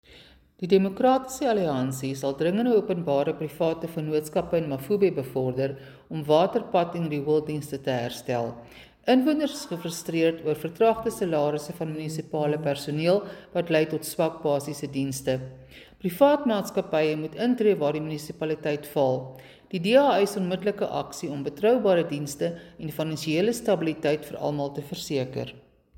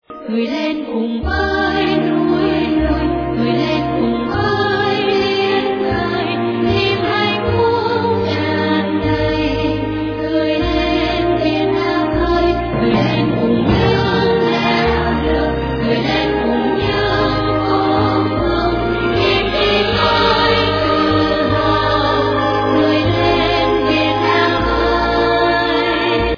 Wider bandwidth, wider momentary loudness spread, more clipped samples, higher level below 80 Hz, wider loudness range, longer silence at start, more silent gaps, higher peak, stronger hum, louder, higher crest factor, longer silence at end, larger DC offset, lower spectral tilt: first, 17 kHz vs 5.4 kHz; first, 11 LU vs 4 LU; neither; second, -60 dBFS vs -30 dBFS; about the same, 2 LU vs 3 LU; about the same, 0.15 s vs 0.1 s; neither; second, -6 dBFS vs -2 dBFS; neither; second, -26 LUFS vs -15 LUFS; first, 20 dB vs 14 dB; first, 0.35 s vs 0 s; neither; about the same, -6 dB/octave vs -7 dB/octave